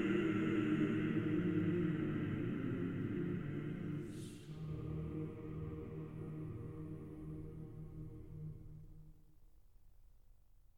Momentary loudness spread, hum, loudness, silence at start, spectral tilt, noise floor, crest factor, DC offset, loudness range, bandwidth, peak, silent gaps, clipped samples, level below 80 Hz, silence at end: 15 LU; none; -41 LUFS; 0 s; -8.5 dB/octave; -66 dBFS; 18 dB; under 0.1%; 15 LU; 11 kHz; -24 dBFS; none; under 0.1%; -58 dBFS; 0.1 s